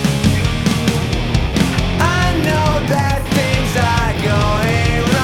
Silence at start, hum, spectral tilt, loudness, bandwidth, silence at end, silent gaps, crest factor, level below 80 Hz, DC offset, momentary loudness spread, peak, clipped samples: 0 s; none; -5.5 dB/octave; -16 LUFS; 17 kHz; 0 s; none; 12 dB; -24 dBFS; under 0.1%; 2 LU; -2 dBFS; under 0.1%